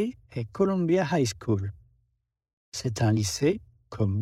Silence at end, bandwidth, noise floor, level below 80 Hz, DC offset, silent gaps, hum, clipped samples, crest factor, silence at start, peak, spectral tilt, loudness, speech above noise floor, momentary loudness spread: 0 s; 14.5 kHz; -76 dBFS; -56 dBFS; under 0.1%; 2.53-2.72 s; none; under 0.1%; 16 dB; 0 s; -12 dBFS; -6 dB/octave; -27 LUFS; 50 dB; 13 LU